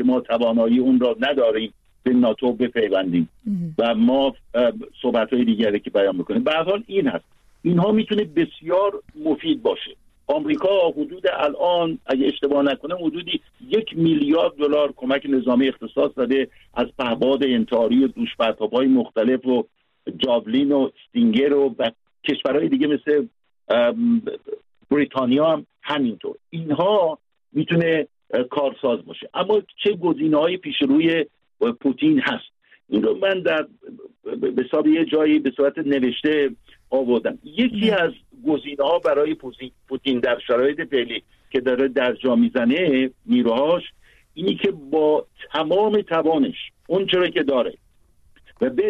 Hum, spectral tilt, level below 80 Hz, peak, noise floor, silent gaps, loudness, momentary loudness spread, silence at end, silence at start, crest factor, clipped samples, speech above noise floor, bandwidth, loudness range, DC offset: none; -8 dB/octave; -58 dBFS; -6 dBFS; -56 dBFS; none; -21 LUFS; 9 LU; 0 s; 0 s; 14 dB; under 0.1%; 36 dB; 5.6 kHz; 2 LU; under 0.1%